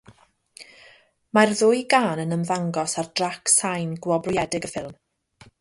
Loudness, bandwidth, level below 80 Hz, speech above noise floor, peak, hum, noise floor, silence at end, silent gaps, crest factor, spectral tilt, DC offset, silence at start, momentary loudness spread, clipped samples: -22 LUFS; 11.5 kHz; -60 dBFS; 32 dB; -4 dBFS; none; -55 dBFS; 0.7 s; none; 20 dB; -3.5 dB/octave; under 0.1%; 0.6 s; 10 LU; under 0.1%